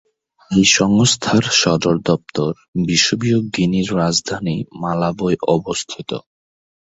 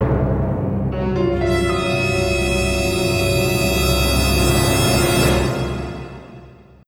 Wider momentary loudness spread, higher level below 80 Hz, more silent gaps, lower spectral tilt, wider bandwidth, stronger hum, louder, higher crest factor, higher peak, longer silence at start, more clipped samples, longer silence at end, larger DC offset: first, 11 LU vs 8 LU; second, -48 dBFS vs -26 dBFS; first, 2.68-2.73 s vs none; about the same, -4 dB/octave vs -5 dB/octave; second, 8.2 kHz vs 19.5 kHz; neither; about the same, -17 LUFS vs -18 LUFS; about the same, 18 dB vs 14 dB; first, 0 dBFS vs -4 dBFS; first, 0.5 s vs 0 s; neither; first, 0.65 s vs 0.35 s; neither